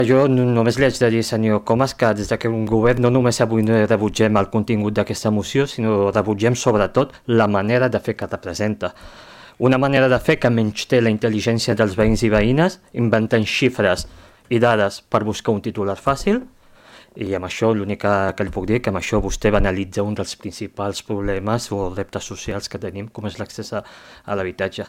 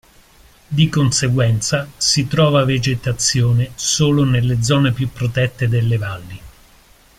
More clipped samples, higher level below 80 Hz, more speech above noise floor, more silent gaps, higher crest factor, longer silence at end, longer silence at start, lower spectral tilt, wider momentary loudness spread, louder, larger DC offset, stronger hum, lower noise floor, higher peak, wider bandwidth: neither; about the same, -38 dBFS vs -42 dBFS; second, 28 dB vs 33 dB; neither; about the same, 16 dB vs 14 dB; second, 0 s vs 0.7 s; second, 0 s vs 0.7 s; first, -6 dB/octave vs -4.5 dB/octave; first, 11 LU vs 6 LU; second, -19 LUFS vs -16 LUFS; neither; neither; about the same, -47 dBFS vs -49 dBFS; about the same, -4 dBFS vs -2 dBFS; about the same, 16 kHz vs 15.5 kHz